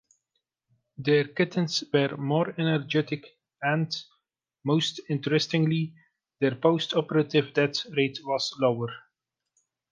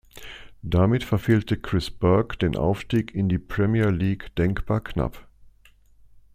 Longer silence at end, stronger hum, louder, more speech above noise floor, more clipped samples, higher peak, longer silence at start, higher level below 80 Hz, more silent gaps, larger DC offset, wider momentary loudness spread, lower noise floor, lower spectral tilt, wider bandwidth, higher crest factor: first, 0.9 s vs 0.15 s; neither; second, -27 LUFS vs -24 LUFS; first, 55 dB vs 32 dB; neither; about the same, -6 dBFS vs -6 dBFS; first, 1 s vs 0.15 s; second, -72 dBFS vs -40 dBFS; neither; neither; about the same, 9 LU vs 8 LU; first, -81 dBFS vs -55 dBFS; second, -5.5 dB/octave vs -8 dB/octave; second, 9.4 kHz vs 15 kHz; about the same, 20 dB vs 18 dB